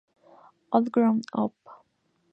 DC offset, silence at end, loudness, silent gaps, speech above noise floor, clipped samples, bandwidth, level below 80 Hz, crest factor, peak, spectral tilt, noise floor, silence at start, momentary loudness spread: under 0.1%; 0.6 s; -26 LUFS; none; 47 dB; under 0.1%; 6.6 kHz; -76 dBFS; 22 dB; -6 dBFS; -8 dB/octave; -71 dBFS; 0.7 s; 8 LU